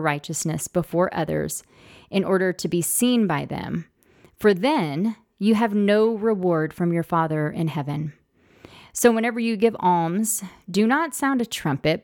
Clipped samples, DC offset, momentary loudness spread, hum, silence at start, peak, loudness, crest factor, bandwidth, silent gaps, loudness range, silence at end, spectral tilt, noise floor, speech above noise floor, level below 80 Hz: under 0.1%; under 0.1%; 8 LU; none; 0 s; -4 dBFS; -22 LUFS; 18 dB; 19 kHz; none; 2 LU; 0.05 s; -5 dB/octave; -55 dBFS; 33 dB; -56 dBFS